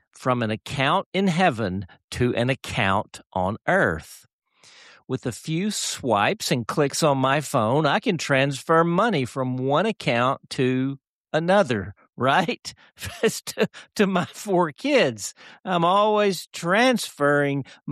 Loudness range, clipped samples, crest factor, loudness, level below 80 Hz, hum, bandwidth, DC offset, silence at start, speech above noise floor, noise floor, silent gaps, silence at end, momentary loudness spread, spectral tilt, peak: 4 LU; under 0.1%; 16 dB; -23 LUFS; -56 dBFS; none; 14 kHz; under 0.1%; 0.2 s; 29 dB; -51 dBFS; 1.06-1.12 s, 2.04-2.08 s, 4.33-4.39 s, 11.07-11.24 s, 16.47-16.51 s; 0 s; 10 LU; -5 dB/octave; -8 dBFS